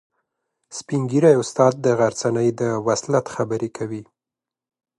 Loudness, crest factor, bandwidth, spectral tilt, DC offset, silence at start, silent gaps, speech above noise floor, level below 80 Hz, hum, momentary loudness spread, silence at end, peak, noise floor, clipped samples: -20 LUFS; 20 dB; 11.5 kHz; -6 dB/octave; under 0.1%; 0.7 s; none; 68 dB; -62 dBFS; none; 14 LU; 0.95 s; -2 dBFS; -88 dBFS; under 0.1%